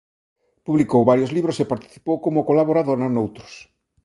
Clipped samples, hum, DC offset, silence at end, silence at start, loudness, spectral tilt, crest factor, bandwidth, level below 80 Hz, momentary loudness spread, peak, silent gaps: under 0.1%; none; under 0.1%; 0.45 s; 0.65 s; -20 LUFS; -8 dB/octave; 20 dB; 11.5 kHz; -58 dBFS; 11 LU; -2 dBFS; none